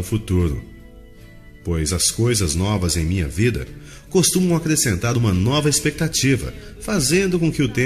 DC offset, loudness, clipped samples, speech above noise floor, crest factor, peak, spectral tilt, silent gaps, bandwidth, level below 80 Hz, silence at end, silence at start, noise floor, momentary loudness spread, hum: under 0.1%; -19 LUFS; under 0.1%; 23 dB; 16 dB; -4 dBFS; -4.5 dB/octave; none; 14 kHz; -36 dBFS; 0 s; 0 s; -42 dBFS; 10 LU; none